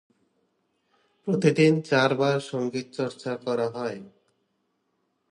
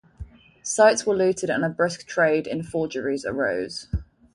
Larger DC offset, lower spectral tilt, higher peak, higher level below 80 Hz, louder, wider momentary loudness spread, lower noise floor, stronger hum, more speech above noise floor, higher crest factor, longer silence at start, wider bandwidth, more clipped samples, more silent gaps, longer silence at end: neither; first, -6 dB/octave vs -4.5 dB/octave; about the same, -6 dBFS vs -4 dBFS; second, -72 dBFS vs -44 dBFS; about the same, -25 LUFS vs -23 LUFS; about the same, 13 LU vs 13 LU; first, -74 dBFS vs -42 dBFS; neither; first, 50 dB vs 20 dB; about the same, 22 dB vs 20 dB; first, 1.25 s vs 0.2 s; about the same, 11.5 kHz vs 11.5 kHz; neither; neither; first, 1.2 s vs 0.3 s